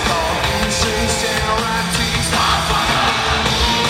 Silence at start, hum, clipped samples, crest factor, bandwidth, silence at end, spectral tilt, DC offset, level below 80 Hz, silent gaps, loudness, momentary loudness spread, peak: 0 s; none; under 0.1%; 14 dB; 16.5 kHz; 0 s; -3 dB/octave; under 0.1%; -28 dBFS; none; -16 LUFS; 2 LU; -2 dBFS